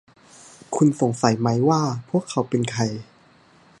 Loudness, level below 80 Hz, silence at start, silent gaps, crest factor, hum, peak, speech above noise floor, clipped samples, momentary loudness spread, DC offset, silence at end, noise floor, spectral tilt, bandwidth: -22 LUFS; -60 dBFS; 0.7 s; none; 22 dB; none; -2 dBFS; 33 dB; under 0.1%; 7 LU; under 0.1%; 0.75 s; -54 dBFS; -6 dB/octave; 11.5 kHz